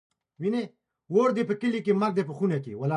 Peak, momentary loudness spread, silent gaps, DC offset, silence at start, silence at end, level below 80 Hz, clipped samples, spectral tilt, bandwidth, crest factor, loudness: -10 dBFS; 7 LU; none; under 0.1%; 0.4 s; 0 s; -74 dBFS; under 0.1%; -8 dB/octave; 10.5 kHz; 16 dB; -27 LUFS